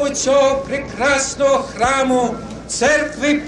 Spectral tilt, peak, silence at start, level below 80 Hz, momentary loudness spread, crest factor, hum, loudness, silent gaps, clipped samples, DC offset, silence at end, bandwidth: -3 dB/octave; -4 dBFS; 0 s; -42 dBFS; 8 LU; 12 dB; none; -17 LUFS; none; under 0.1%; under 0.1%; 0 s; 11.5 kHz